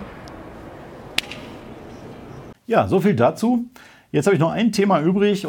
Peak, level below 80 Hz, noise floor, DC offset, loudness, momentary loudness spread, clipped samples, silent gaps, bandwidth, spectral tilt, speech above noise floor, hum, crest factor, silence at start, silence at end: -2 dBFS; -52 dBFS; -39 dBFS; under 0.1%; -19 LUFS; 21 LU; under 0.1%; none; 18 kHz; -6 dB/octave; 21 dB; none; 20 dB; 0 s; 0 s